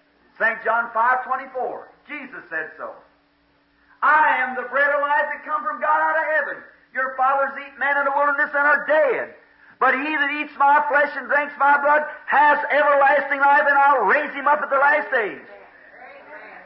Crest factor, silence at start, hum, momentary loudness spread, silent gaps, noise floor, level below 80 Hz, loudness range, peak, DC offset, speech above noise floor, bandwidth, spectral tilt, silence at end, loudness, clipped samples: 14 dB; 0.4 s; none; 14 LU; none; -61 dBFS; -72 dBFS; 7 LU; -8 dBFS; under 0.1%; 42 dB; 5.8 kHz; -7.5 dB/octave; 0 s; -19 LUFS; under 0.1%